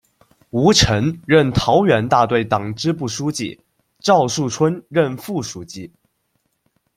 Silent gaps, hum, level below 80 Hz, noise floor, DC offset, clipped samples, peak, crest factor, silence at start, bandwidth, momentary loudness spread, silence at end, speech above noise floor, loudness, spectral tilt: none; none; -42 dBFS; -69 dBFS; under 0.1%; under 0.1%; 0 dBFS; 18 dB; 0.55 s; 16 kHz; 12 LU; 1.1 s; 52 dB; -17 LUFS; -5 dB/octave